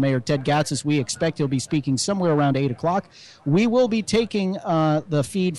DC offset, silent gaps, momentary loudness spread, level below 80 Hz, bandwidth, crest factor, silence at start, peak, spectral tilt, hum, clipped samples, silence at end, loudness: under 0.1%; none; 5 LU; -56 dBFS; 12.5 kHz; 12 dB; 0 s; -8 dBFS; -5.5 dB/octave; none; under 0.1%; 0 s; -22 LUFS